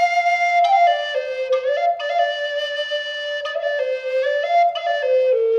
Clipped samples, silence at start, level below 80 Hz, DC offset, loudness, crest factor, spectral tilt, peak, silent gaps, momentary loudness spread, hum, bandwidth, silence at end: under 0.1%; 0 s; -72 dBFS; under 0.1%; -19 LUFS; 14 dB; 1 dB/octave; -6 dBFS; none; 8 LU; none; 8 kHz; 0 s